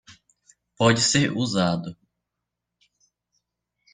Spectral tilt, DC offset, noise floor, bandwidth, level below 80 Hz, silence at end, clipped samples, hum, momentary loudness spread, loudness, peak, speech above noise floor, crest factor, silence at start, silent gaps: -4 dB/octave; under 0.1%; -83 dBFS; 9.8 kHz; -58 dBFS; 2 s; under 0.1%; none; 10 LU; -21 LUFS; -4 dBFS; 62 dB; 22 dB; 0.1 s; none